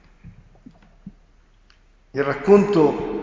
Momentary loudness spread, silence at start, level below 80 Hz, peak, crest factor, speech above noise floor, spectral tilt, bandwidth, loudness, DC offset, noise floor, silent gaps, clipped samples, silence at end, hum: 11 LU; 0.25 s; -50 dBFS; -2 dBFS; 20 dB; 37 dB; -8 dB/octave; 7.6 kHz; -18 LUFS; under 0.1%; -54 dBFS; none; under 0.1%; 0 s; none